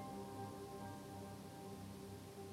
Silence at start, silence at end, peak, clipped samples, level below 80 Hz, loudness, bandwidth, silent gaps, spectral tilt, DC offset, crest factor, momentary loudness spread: 0 s; 0 s; -38 dBFS; under 0.1%; -72 dBFS; -52 LUFS; 17 kHz; none; -5.5 dB/octave; under 0.1%; 14 dB; 3 LU